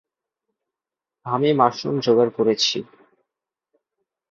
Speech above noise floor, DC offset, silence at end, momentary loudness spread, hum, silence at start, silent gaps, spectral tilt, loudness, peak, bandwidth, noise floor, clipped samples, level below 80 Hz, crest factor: 69 dB; under 0.1%; 1.5 s; 10 LU; none; 1.25 s; none; -5 dB/octave; -20 LUFS; -2 dBFS; 7.6 kHz; -88 dBFS; under 0.1%; -68 dBFS; 22 dB